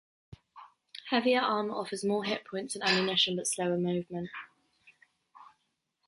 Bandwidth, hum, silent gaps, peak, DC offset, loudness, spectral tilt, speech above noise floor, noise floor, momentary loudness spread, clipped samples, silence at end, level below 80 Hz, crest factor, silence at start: 11.5 kHz; none; none; -12 dBFS; under 0.1%; -30 LUFS; -3.5 dB/octave; 49 dB; -79 dBFS; 14 LU; under 0.1%; 0.6 s; -72 dBFS; 20 dB; 0.3 s